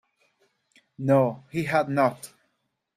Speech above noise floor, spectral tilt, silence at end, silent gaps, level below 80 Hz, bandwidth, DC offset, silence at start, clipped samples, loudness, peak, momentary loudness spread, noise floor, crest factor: 53 dB; -7 dB/octave; 0.7 s; none; -66 dBFS; 15 kHz; under 0.1%; 1 s; under 0.1%; -24 LUFS; -8 dBFS; 16 LU; -76 dBFS; 20 dB